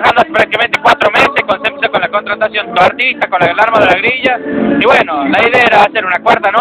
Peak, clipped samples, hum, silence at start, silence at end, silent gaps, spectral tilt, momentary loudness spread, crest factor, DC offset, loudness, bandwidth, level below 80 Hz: 0 dBFS; 1%; none; 0 s; 0 s; none; -4.5 dB/octave; 6 LU; 10 dB; under 0.1%; -10 LUFS; 14.5 kHz; -46 dBFS